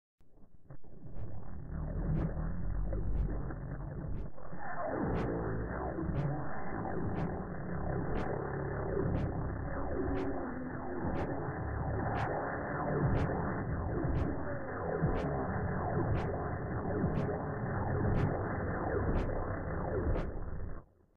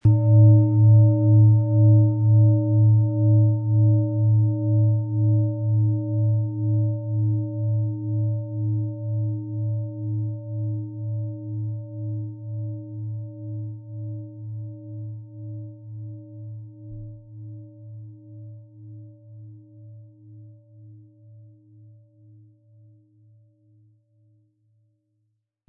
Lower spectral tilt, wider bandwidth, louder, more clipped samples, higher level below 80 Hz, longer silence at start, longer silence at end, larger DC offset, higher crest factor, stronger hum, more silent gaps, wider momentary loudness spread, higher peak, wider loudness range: second, -10 dB/octave vs -16 dB/octave; first, 6.6 kHz vs 1 kHz; second, -37 LUFS vs -21 LUFS; neither; first, -42 dBFS vs -58 dBFS; first, 0.2 s vs 0.05 s; second, 0 s vs 4.75 s; first, 0.3% vs under 0.1%; about the same, 14 dB vs 16 dB; neither; neither; second, 9 LU vs 24 LU; second, -20 dBFS vs -6 dBFS; second, 4 LU vs 24 LU